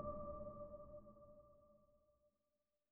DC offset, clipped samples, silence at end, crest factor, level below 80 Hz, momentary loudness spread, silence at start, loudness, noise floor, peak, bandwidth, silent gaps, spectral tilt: under 0.1%; under 0.1%; 0.65 s; 18 dB; -66 dBFS; 16 LU; 0 s; -55 LUFS; under -90 dBFS; -36 dBFS; 2.4 kHz; none; -9 dB/octave